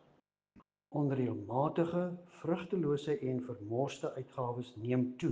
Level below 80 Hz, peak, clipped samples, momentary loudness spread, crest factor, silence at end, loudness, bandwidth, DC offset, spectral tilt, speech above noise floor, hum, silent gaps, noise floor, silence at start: -74 dBFS; -18 dBFS; under 0.1%; 8 LU; 18 dB; 0 s; -36 LUFS; 9.4 kHz; under 0.1%; -8 dB/octave; 37 dB; none; none; -72 dBFS; 0.55 s